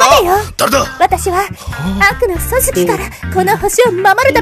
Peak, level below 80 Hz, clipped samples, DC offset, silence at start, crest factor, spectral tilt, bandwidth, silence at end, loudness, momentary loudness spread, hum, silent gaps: 0 dBFS; -28 dBFS; 0.3%; 0.2%; 0 s; 12 dB; -3.5 dB/octave; 15 kHz; 0 s; -12 LUFS; 8 LU; none; none